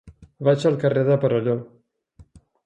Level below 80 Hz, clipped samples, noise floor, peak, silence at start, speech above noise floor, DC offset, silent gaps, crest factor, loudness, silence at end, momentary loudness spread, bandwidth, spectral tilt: -58 dBFS; under 0.1%; -53 dBFS; -4 dBFS; 0.05 s; 33 dB; under 0.1%; none; 18 dB; -21 LUFS; 0.45 s; 6 LU; 9.4 kHz; -8 dB/octave